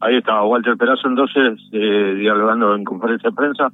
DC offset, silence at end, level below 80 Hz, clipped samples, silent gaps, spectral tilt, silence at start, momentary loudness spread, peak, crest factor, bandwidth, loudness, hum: under 0.1%; 0.05 s; -76 dBFS; under 0.1%; none; -7.5 dB/octave; 0 s; 4 LU; -2 dBFS; 14 dB; 4 kHz; -16 LUFS; 50 Hz at -60 dBFS